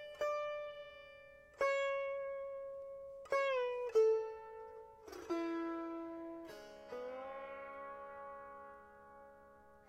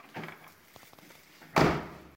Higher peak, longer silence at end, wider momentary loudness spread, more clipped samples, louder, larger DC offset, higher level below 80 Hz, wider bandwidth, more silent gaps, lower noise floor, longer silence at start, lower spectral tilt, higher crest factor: second, -22 dBFS vs -8 dBFS; about the same, 0.05 s vs 0.15 s; second, 21 LU vs 26 LU; neither; second, -40 LUFS vs -28 LUFS; neither; second, -76 dBFS vs -52 dBFS; second, 14 kHz vs 16.5 kHz; neither; first, -62 dBFS vs -56 dBFS; second, 0 s vs 0.15 s; second, -4 dB/octave vs -5.5 dB/octave; second, 18 dB vs 26 dB